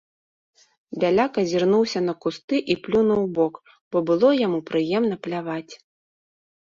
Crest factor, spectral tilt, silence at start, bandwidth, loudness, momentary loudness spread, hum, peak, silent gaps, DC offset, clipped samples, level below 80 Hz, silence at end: 16 dB; -6 dB/octave; 0.9 s; 7.6 kHz; -22 LUFS; 10 LU; none; -8 dBFS; 2.44-2.48 s, 3.81-3.91 s; under 0.1%; under 0.1%; -62 dBFS; 0.9 s